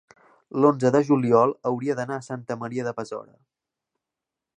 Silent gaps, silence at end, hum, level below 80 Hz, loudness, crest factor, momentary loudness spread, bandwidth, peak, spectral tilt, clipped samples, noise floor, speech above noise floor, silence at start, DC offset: none; 1.35 s; none; -70 dBFS; -23 LUFS; 20 dB; 14 LU; 9.8 kHz; -4 dBFS; -7.5 dB/octave; under 0.1%; -87 dBFS; 64 dB; 0.55 s; under 0.1%